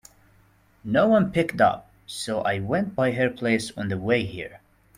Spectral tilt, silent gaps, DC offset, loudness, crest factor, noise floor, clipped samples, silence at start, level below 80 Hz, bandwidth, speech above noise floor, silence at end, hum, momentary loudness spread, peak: -6 dB/octave; none; under 0.1%; -24 LUFS; 18 dB; -59 dBFS; under 0.1%; 0.85 s; -56 dBFS; 16 kHz; 36 dB; 0.4 s; none; 16 LU; -6 dBFS